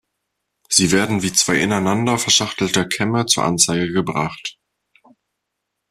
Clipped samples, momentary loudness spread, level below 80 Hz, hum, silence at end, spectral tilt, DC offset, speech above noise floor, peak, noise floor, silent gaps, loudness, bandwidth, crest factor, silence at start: under 0.1%; 8 LU; -54 dBFS; none; 1.4 s; -3 dB/octave; under 0.1%; 60 dB; 0 dBFS; -78 dBFS; none; -17 LUFS; 15 kHz; 20 dB; 0.7 s